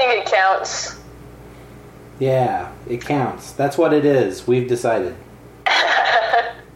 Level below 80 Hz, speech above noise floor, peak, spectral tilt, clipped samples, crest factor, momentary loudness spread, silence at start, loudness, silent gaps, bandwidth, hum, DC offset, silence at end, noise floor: -50 dBFS; 22 dB; -4 dBFS; -4.5 dB/octave; under 0.1%; 16 dB; 13 LU; 0 s; -18 LUFS; none; 16.5 kHz; none; under 0.1%; 0.05 s; -40 dBFS